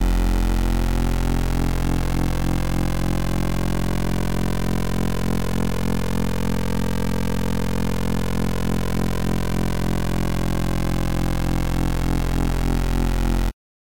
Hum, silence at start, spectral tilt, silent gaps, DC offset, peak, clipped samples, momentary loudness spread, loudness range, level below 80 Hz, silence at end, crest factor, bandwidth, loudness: none; 0 s; -6 dB/octave; none; 5%; -10 dBFS; under 0.1%; 2 LU; 1 LU; -26 dBFS; 0.4 s; 12 dB; 17 kHz; -24 LUFS